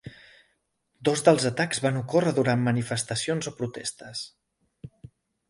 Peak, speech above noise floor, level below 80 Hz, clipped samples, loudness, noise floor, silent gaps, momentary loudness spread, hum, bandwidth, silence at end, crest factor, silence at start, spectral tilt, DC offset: -6 dBFS; 48 dB; -64 dBFS; under 0.1%; -26 LUFS; -73 dBFS; none; 17 LU; none; 11.5 kHz; 0.6 s; 22 dB; 0.05 s; -5 dB/octave; under 0.1%